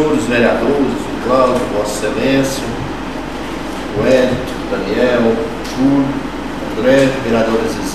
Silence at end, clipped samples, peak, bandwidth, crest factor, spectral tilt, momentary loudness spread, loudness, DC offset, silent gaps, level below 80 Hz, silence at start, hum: 0 s; under 0.1%; 0 dBFS; 14.5 kHz; 14 dB; -5.5 dB/octave; 11 LU; -15 LUFS; 2%; none; -34 dBFS; 0 s; none